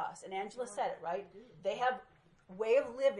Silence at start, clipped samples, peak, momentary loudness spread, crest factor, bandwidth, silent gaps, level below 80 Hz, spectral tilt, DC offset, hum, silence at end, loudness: 0 s; under 0.1%; -18 dBFS; 12 LU; 18 dB; 11 kHz; none; -76 dBFS; -3.5 dB/octave; under 0.1%; none; 0 s; -36 LUFS